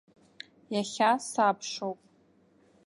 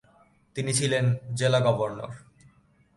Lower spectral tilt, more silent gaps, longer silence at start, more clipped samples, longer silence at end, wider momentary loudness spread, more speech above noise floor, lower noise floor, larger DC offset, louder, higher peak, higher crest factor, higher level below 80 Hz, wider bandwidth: about the same, -3.5 dB/octave vs -4.5 dB/octave; neither; first, 0.7 s vs 0.55 s; neither; first, 0.95 s vs 0.8 s; first, 22 LU vs 16 LU; about the same, 36 dB vs 35 dB; about the same, -64 dBFS vs -61 dBFS; neither; second, -29 LUFS vs -25 LUFS; about the same, -12 dBFS vs -10 dBFS; about the same, 20 dB vs 18 dB; second, -80 dBFS vs -62 dBFS; about the same, 11.5 kHz vs 11.5 kHz